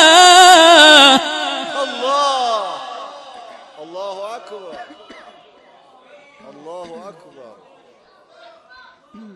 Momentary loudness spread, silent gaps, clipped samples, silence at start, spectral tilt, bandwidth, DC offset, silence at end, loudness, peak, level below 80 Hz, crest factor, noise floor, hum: 28 LU; none; 0.1%; 0 s; 0.5 dB/octave; 16 kHz; under 0.1%; 2.25 s; -9 LUFS; 0 dBFS; -64 dBFS; 16 dB; -50 dBFS; none